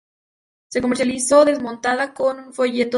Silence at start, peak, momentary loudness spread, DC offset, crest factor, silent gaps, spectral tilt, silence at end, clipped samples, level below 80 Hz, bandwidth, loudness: 0.7 s; -2 dBFS; 9 LU; under 0.1%; 18 dB; none; -3 dB/octave; 0 s; under 0.1%; -56 dBFS; 11.5 kHz; -19 LUFS